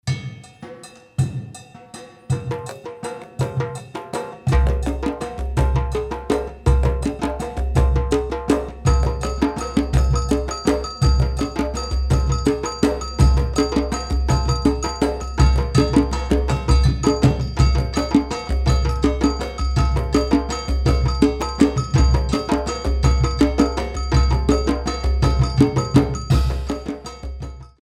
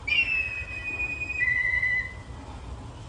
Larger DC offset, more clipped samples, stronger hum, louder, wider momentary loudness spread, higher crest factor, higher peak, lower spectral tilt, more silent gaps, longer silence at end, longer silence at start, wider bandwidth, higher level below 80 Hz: neither; neither; neither; first, -20 LUFS vs -25 LUFS; second, 12 LU vs 19 LU; about the same, 18 dB vs 16 dB; first, 0 dBFS vs -14 dBFS; first, -6.5 dB/octave vs -3.5 dB/octave; neither; first, 0.15 s vs 0 s; about the same, 0.05 s vs 0 s; first, 11.5 kHz vs 10 kHz; first, -22 dBFS vs -44 dBFS